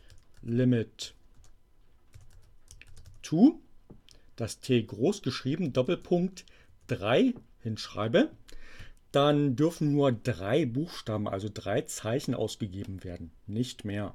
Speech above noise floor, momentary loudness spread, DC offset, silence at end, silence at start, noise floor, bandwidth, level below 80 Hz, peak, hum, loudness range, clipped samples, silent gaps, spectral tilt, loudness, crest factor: 29 dB; 15 LU; under 0.1%; 0.05 s; 0.15 s; -58 dBFS; 15 kHz; -56 dBFS; -10 dBFS; none; 4 LU; under 0.1%; none; -6.5 dB/octave; -29 LUFS; 20 dB